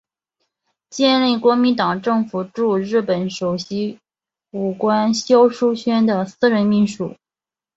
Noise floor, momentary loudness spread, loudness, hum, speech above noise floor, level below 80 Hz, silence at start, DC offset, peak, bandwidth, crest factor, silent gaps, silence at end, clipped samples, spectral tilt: under -90 dBFS; 10 LU; -18 LUFS; none; over 73 dB; -62 dBFS; 0.9 s; under 0.1%; -2 dBFS; 8 kHz; 16 dB; none; 0.65 s; under 0.1%; -5.5 dB/octave